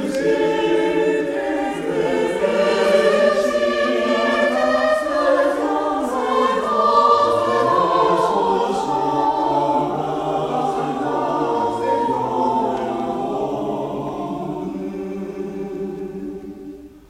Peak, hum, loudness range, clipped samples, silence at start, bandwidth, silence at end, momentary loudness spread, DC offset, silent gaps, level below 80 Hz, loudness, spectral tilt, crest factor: -2 dBFS; none; 8 LU; under 0.1%; 0 s; 15.5 kHz; 0.1 s; 12 LU; under 0.1%; none; -52 dBFS; -19 LUFS; -5.5 dB/octave; 18 dB